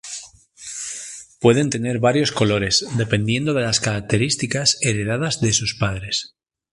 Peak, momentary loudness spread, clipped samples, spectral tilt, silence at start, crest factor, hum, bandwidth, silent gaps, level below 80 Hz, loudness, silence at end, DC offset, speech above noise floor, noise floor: 0 dBFS; 14 LU; under 0.1%; -4 dB/octave; 0.05 s; 20 dB; none; 11.5 kHz; none; -46 dBFS; -19 LUFS; 0.45 s; under 0.1%; 22 dB; -41 dBFS